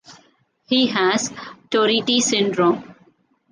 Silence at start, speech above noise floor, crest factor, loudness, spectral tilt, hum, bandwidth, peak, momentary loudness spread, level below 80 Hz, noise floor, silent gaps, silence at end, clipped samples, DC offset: 0.1 s; 40 dB; 16 dB; -19 LUFS; -3 dB/octave; none; 10 kHz; -4 dBFS; 9 LU; -66 dBFS; -59 dBFS; none; 0.6 s; under 0.1%; under 0.1%